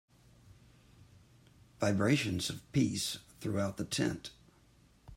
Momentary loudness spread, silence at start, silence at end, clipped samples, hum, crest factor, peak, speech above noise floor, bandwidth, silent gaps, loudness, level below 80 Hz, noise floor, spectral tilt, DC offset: 9 LU; 1.8 s; 0 s; under 0.1%; none; 20 dB; -16 dBFS; 31 dB; 16 kHz; none; -34 LUFS; -64 dBFS; -64 dBFS; -5 dB/octave; under 0.1%